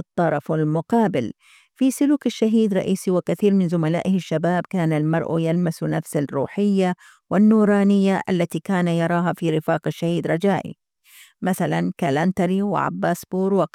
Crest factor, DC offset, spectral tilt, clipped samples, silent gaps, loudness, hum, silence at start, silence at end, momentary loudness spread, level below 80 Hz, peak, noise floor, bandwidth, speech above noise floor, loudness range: 14 dB; under 0.1%; -7 dB/octave; under 0.1%; none; -21 LUFS; none; 0.15 s; 0.05 s; 6 LU; -64 dBFS; -8 dBFS; -51 dBFS; 15 kHz; 31 dB; 3 LU